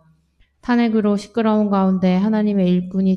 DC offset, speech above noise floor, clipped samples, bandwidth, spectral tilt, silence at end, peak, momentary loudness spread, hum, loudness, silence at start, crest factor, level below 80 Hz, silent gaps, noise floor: under 0.1%; 42 dB; under 0.1%; 8.4 kHz; -8.5 dB/octave; 0 s; -4 dBFS; 3 LU; none; -18 LUFS; 0.65 s; 12 dB; -52 dBFS; none; -59 dBFS